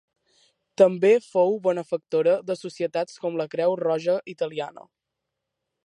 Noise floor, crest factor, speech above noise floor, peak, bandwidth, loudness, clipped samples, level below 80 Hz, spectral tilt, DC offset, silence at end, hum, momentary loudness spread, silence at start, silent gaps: -83 dBFS; 20 dB; 60 dB; -4 dBFS; 11 kHz; -24 LUFS; under 0.1%; -80 dBFS; -6 dB/octave; under 0.1%; 1.05 s; none; 10 LU; 0.8 s; none